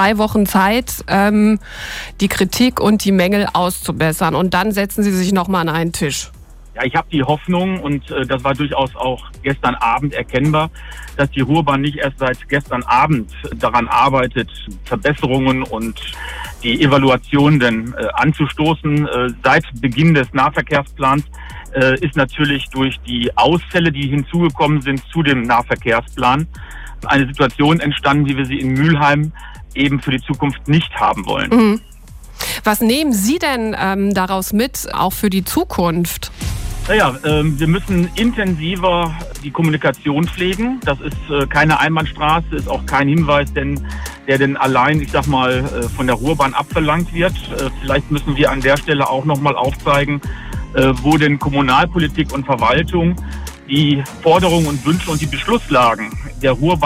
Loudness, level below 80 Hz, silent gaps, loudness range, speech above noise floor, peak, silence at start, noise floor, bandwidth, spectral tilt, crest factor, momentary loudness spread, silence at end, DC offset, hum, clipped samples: -16 LUFS; -32 dBFS; none; 2 LU; 20 dB; -2 dBFS; 0 s; -36 dBFS; 16 kHz; -5.5 dB/octave; 14 dB; 9 LU; 0 s; under 0.1%; none; under 0.1%